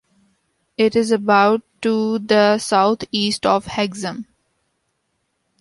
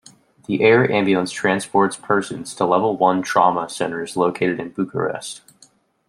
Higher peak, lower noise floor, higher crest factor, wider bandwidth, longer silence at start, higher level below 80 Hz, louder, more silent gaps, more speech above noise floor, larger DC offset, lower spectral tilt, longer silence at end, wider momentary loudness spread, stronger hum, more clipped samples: about the same, -2 dBFS vs -2 dBFS; first, -71 dBFS vs -55 dBFS; about the same, 18 dB vs 18 dB; second, 11.5 kHz vs 13.5 kHz; first, 0.8 s vs 0.5 s; first, -56 dBFS vs -64 dBFS; about the same, -18 LUFS vs -19 LUFS; neither; first, 54 dB vs 36 dB; neither; about the same, -4.5 dB/octave vs -5 dB/octave; first, 1.4 s vs 0.7 s; about the same, 10 LU vs 10 LU; neither; neither